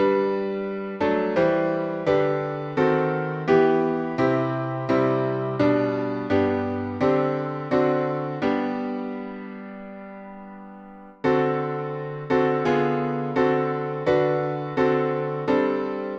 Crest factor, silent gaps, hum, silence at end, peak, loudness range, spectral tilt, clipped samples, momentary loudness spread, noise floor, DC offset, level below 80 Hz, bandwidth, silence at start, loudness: 18 dB; none; none; 0 s; -6 dBFS; 7 LU; -8.5 dB/octave; under 0.1%; 13 LU; -43 dBFS; under 0.1%; -58 dBFS; 7 kHz; 0 s; -23 LUFS